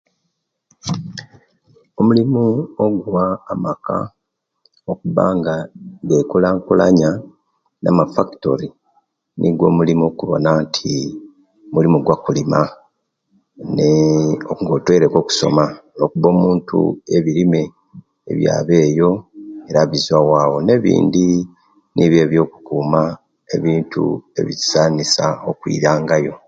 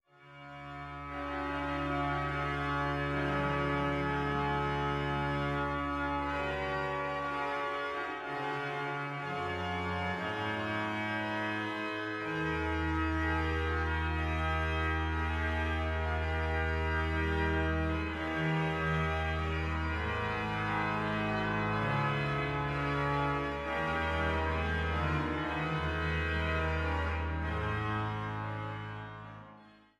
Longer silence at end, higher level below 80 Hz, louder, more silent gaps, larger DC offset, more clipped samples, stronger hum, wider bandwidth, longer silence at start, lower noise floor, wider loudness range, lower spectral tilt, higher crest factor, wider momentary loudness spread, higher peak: second, 0.1 s vs 0.3 s; second, -50 dBFS vs -42 dBFS; first, -16 LUFS vs -33 LUFS; neither; neither; neither; neither; second, 7.8 kHz vs 10.5 kHz; first, 0.85 s vs 0.2 s; first, -72 dBFS vs -57 dBFS; about the same, 4 LU vs 3 LU; about the same, -6 dB/octave vs -7 dB/octave; about the same, 16 dB vs 14 dB; first, 12 LU vs 5 LU; first, 0 dBFS vs -20 dBFS